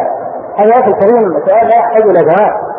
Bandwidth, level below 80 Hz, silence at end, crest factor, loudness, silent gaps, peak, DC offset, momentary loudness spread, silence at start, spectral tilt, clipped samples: 3.8 kHz; -54 dBFS; 0 s; 8 dB; -8 LUFS; none; 0 dBFS; under 0.1%; 7 LU; 0 s; -10.5 dB/octave; under 0.1%